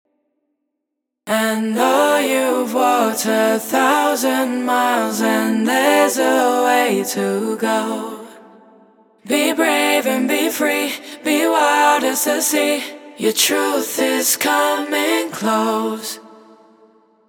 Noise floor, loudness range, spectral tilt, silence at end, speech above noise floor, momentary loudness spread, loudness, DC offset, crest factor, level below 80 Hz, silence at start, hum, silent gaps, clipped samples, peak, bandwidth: -78 dBFS; 3 LU; -2.5 dB/octave; 0.95 s; 62 dB; 7 LU; -17 LUFS; under 0.1%; 18 dB; -78 dBFS; 1.25 s; none; none; under 0.1%; 0 dBFS; over 20 kHz